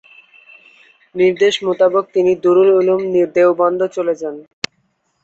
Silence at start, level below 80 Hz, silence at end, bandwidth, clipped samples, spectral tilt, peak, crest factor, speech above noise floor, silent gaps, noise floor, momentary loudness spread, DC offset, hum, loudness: 1.15 s; -62 dBFS; 0.85 s; 8 kHz; under 0.1%; -5.5 dB/octave; -2 dBFS; 14 dB; 50 dB; none; -64 dBFS; 15 LU; under 0.1%; none; -14 LUFS